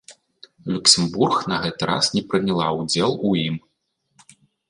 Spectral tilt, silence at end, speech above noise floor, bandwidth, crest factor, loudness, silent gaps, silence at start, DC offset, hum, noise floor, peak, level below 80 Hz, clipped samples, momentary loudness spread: -3.5 dB/octave; 1.1 s; 51 dB; 11.5 kHz; 22 dB; -20 LUFS; none; 0.1 s; under 0.1%; none; -72 dBFS; 0 dBFS; -56 dBFS; under 0.1%; 12 LU